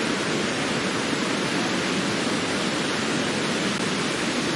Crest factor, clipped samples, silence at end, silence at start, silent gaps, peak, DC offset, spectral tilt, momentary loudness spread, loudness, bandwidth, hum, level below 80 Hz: 14 dB; under 0.1%; 0 s; 0 s; none; -12 dBFS; under 0.1%; -3.5 dB/octave; 1 LU; -24 LUFS; 11.5 kHz; none; -58 dBFS